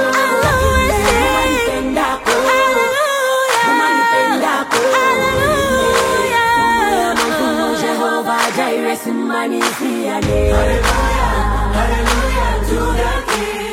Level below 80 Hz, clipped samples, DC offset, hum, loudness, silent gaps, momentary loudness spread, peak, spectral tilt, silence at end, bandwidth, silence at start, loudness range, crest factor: -24 dBFS; under 0.1%; under 0.1%; none; -15 LUFS; none; 5 LU; -2 dBFS; -4 dB/octave; 0 s; 16.5 kHz; 0 s; 3 LU; 14 dB